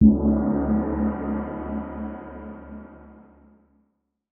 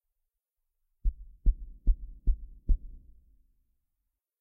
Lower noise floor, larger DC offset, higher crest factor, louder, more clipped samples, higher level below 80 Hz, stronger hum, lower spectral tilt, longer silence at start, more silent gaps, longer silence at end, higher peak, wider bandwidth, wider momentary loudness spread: second, -72 dBFS vs -84 dBFS; neither; about the same, 20 dB vs 20 dB; first, -25 LUFS vs -36 LUFS; neither; about the same, -36 dBFS vs -32 dBFS; neither; second, -8.5 dB/octave vs -12.5 dB/octave; second, 0 s vs 1.05 s; neither; second, 1.15 s vs 1.45 s; first, -4 dBFS vs -12 dBFS; first, 2.6 kHz vs 0.6 kHz; first, 19 LU vs 4 LU